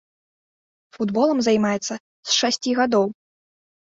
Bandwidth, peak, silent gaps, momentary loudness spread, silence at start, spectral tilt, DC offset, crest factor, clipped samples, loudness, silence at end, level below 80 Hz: 7.8 kHz; -6 dBFS; 2.00-2.23 s; 9 LU; 0.95 s; -3.5 dB/octave; under 0.1%; 18 dB; under 0.1%; -21 LUFS; 0.85 s; -64 dBFS